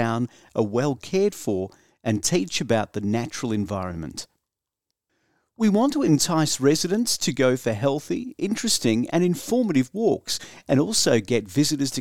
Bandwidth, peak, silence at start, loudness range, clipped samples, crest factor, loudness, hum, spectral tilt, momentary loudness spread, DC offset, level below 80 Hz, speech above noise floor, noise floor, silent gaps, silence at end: 17.5 kHz; -6 dBFS; 0 s; 5 LU; under 0.1%; 18 dB; -23 LUFS; none; -4.5 dB/octave; 9 LU; 0.3%; -58 dBFS; 62 dB; -85 dBFS; none; 0 s